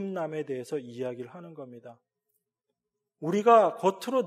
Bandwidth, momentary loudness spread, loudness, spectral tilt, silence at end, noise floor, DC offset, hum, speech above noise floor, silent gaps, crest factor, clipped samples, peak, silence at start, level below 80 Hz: 14.5 kHz; 23 LU; -27 LUFS; -6 dB/octave; 0 s; -85 dBFS; under 0.1%; none; 57 dB; none; 22 dB; under 0.1%; -8 dBFS; 0 s; -88 dBFS